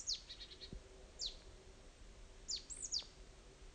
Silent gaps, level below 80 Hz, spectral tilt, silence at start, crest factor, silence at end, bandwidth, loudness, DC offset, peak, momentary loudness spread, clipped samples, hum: none; -60 dBFS; -0.5 dB/octave; 0 s; 20 dB; 0 s; 9.6 kHz; -46 LUFS; under 0.1%; -30 dBFS; 19 LU; under 0.1%; none